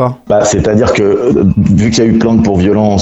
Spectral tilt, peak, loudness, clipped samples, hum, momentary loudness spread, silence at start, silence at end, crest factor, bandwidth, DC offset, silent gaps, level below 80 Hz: -6.5 dB/octave; 0 dBFS; -9 LUFS; under 0.1%; none; 1 LU; 0 s; 0 s; 8 dB; 8.2 kHz; under 0.1%; none; -30 dBFS